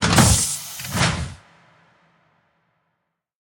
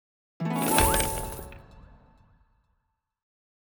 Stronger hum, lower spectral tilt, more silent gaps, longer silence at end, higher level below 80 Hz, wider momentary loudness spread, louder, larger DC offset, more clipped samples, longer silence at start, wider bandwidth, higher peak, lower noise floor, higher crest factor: neither; about the same, -3.5 dB/octave vs -3.5 dB/octave; neither; first, 2.1 s vs 1.8 s; about the same, -36 dBFS vs -40 dBFS; second, 15 LU vs 19 LU; first, -19 LUFS vs -25 LUFS; neither; neither; second, 0 s vs 0.4 s; second, 17 kHz vs over 20 kHz; first, 0 dBFS vs -4 dBFS; about the same, -76 dBFS vs -77 dBFS; about the same, 24 dB vs 26 dB